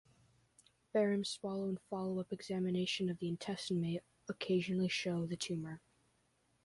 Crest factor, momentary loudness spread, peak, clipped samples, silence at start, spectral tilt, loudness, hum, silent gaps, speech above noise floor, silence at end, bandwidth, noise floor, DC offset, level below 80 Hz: 16 dB; 8 LU; -24 dBFS; under 0.1%; 0.95 s; -5.5 dB/octave; -38 LUFS; none; none; 39 dB; 0.85 s; 11.5 kHz; -76 dBFS; under 0.1%; -74 dBFS